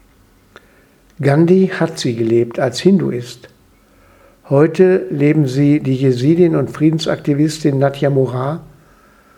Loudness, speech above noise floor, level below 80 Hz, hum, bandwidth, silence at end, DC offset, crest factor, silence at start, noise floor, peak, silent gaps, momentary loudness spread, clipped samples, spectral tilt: -14 LUFS; 36 dB; -52 dBFS; none; 13 kHz; 0.7 s; under 0.1%; 16 dB; 1.2 s; -50 dBFS; 0 dBFS; none; 7 LU; under 0.1%; -7.5 dB/octave